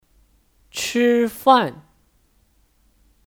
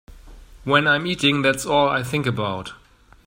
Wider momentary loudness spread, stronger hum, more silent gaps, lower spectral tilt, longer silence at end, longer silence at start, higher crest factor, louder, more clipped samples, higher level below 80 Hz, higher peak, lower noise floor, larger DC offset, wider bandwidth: about the same, 12 LU vs 13 LU; neither; neither; about the same, -3.5 dB/octave vs -4.5 dB/octave; first, 1.5 s vs 0.5 s; first, 0.75 s vs 0.1 s; about the same, 20 dB vs 20 dB; about the same, -18 LUFS vs -20 LUFS; neither; second, -60 dBFS vs -48 dBFS; about the same, -2 dBFS vs -2 dBFS; first, -61 dBFS vs -43 dBFS; neither; first, 19 kHz vs 16 kHz